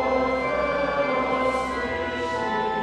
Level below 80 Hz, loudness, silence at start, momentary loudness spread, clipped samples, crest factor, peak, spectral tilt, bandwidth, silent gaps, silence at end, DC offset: -46 dBFS; -24 LUFS; 0 s; 4 LU; under 0.1%; 14 dB; -10 dBFS; -5 dB/octave; 11 kHz; none; 0 s; under 0.1%